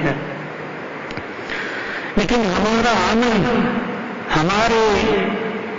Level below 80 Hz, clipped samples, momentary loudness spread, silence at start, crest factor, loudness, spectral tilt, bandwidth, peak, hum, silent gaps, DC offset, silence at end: -40 dBFS; under 0.1%; 13 LU; 0 s; 12 dB; -19 LUFS; -5 dB/octave; 7.6 kHz; -6 dBFS; none; none; under 0.1%; 0 s